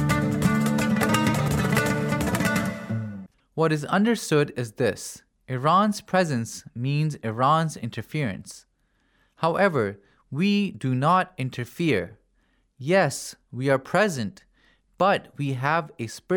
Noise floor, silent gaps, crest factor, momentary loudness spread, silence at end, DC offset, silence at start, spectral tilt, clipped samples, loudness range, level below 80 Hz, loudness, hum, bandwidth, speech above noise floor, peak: -67 dBFS; none; 18 dB; 13 LU; 0 s; under 0.1%; 0 s; -5.5 dB/octave; under 0.1%; 3 LU; -52 dBFS; -24 LUFS; none; 18.5 kHz; 43 dB; -6 dBFS